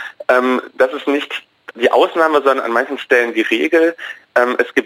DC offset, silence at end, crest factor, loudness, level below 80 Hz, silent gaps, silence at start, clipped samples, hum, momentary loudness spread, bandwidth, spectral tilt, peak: under 0.1%; 0 s; 14 dB; -15 LUFS; -64 dBFS; none; 0 s; under 0.1%; none; 6 LU; 16 kHz; -3.5 dB/octave; 0 dBFS